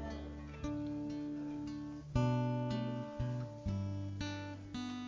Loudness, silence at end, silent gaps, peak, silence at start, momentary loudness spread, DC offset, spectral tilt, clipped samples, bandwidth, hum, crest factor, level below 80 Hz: -40 LUFS; 0 s; none; -22 dBFS; 0 s; 10 LU; under 0.1%; -7.5 dB/octave; under 0.1%; 7.6 kHz; none; 18 dB; -52 dBFS